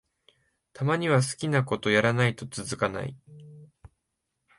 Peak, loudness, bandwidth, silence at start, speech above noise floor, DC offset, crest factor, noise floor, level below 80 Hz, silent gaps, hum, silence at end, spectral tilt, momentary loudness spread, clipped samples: -8 dBFS; -26 LUFS; 11.5 kHz; 0.75 s; 55 dB; under 0.1%; 20 dB; -81 dBFS; -60 dBFS; none; none; 0.95 s; -5.5 dB/octave; 12 LU; under 0.1%